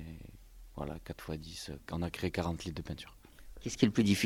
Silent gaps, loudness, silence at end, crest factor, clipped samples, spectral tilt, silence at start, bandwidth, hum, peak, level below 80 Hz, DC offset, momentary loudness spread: none; -37 LUFS; 0 s; 24 dB; under 0.1%; -5.5 dB/octave; 0 s; 16.5 kHz; none; -12 dBFS; -52 dBFS; under 0.1%; 21 LU